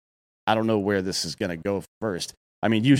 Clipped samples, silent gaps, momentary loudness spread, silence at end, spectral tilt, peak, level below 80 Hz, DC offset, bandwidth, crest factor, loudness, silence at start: under 0.1%; 1.88-2.01 s, 2.37-2.62 s; 8 LU; 0 s; -5 dB/octave; -6 dBFS; -60 dBFS; under 0.1%; 16 kHz; 20 dB; -26 LUFS; 0.45 s